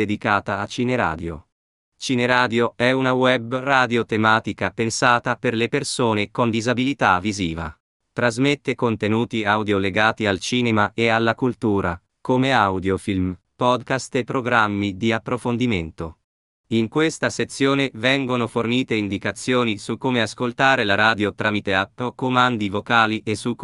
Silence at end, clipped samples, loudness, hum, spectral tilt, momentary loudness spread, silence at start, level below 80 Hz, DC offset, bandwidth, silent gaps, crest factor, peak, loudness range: 0 s; under 0.1%; -20 LUFS; none; -5 dB/octave; 7 LU; 0 s; -52 dBFS; under 0.1%; 11.5 kHz; 1.52-1.92 s, 7.80-8.00 s, 16.24-16.64 s; 20 dB; 0 dBFS; 3 LU